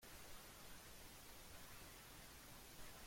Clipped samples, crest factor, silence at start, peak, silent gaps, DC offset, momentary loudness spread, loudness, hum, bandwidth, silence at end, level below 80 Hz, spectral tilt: under 0.1%; 14 dB; 0 s; -44 dBFS; none; under 0.1%; 1 LU; -59 LUFS; none; 16.5 kHz; 0 s; -66 dBFS; -2.5 dB/octave